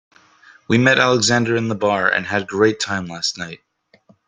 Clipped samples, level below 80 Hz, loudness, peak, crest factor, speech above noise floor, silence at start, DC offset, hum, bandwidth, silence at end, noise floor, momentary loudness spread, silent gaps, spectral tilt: under 0.1%; -58 dBFS; -17 LUFS; 0 dBFS; 18 dB; 37 dB; 0.7 s; under 0.1%; none; 9.6 kHz; 0.7 s; -55 dBFS; 9 LU; none; -4 dB/octave